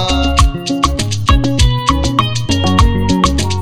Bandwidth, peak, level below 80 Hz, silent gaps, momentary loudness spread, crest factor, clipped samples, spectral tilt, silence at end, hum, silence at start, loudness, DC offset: 14.5 kHz; 0 dBFS; -18 dBFS; none; 3 LU; 12 dB; 0.1%; -5 dB/octave; 0 s; none; 0 s; -13 LUFS; 3%